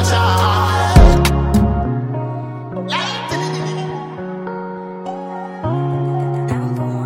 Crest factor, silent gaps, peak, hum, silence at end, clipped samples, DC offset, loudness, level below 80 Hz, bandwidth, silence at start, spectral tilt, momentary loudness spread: 16 dB; none; 0 dBFS; none; 0 s; under 0.1%; under 0.1%; -18 LUFS; -22 dBFS; 16.5 kHz; 0 s; -6 dB/octave; 15 LU